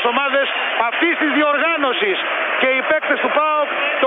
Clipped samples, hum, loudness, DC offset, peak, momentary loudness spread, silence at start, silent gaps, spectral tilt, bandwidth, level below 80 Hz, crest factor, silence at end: under 0.1%; none; -17 LUFS; under 0.1%; 0 dBFS; 3 LU; 0 s; none; -5.5 dB/octave; 4.6 kHz; -68 dBFS; 16 dB; 0 s